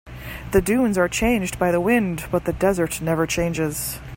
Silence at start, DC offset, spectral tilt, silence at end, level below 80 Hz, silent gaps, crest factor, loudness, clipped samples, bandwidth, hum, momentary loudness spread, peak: 0.05 s; under 0.1%; -5 dB/octave; 0 s; -38 dBFS; none; 16 dB; -21 LUFS; under 0.1%; 16.5 kHz; none; 6 LU; -4 dBFS